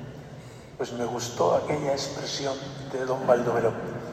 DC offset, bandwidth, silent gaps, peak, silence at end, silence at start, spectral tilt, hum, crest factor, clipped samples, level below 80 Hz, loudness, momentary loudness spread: under 0.1%; 15 kHz; none; -6 dBFS; 0 s; 0 s; -4.5 dB/octave; none; 22 dB; under 0.1%; -58 dBFS; -27 LUFS; 19 LU